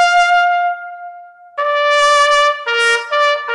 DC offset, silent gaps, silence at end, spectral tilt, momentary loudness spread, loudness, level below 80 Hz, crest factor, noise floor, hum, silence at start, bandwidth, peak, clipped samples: under 0.1%; none; 0 s; 2.5 dB/octave; 19 LU; -13 LUFS; -54 dBFS; 10 dB; -36 dBFS; none; 0 s; 11.5 kHz; -4 dBFS; under 0.1%